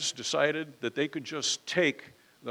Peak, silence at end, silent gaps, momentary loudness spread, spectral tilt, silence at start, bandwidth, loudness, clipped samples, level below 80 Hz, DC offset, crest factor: -10 dBFS; 0 s; none; 8 LU; -2.5 dB/octave; 0 s; 16.5 kHz; -30 LUFS; under 0.1%; -80 dBFS; under 0.1%; 20 dB